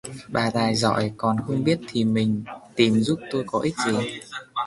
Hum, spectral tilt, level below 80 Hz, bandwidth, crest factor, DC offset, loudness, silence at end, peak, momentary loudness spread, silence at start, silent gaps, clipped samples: none; -5.5 dB/octave; -56 dBFS; 11.5 kHz; 20 dB; under 0.1%; -24 LUFS; 0 s; -4 dBFS; 9 LU; 0.05 s; none; under 0.1%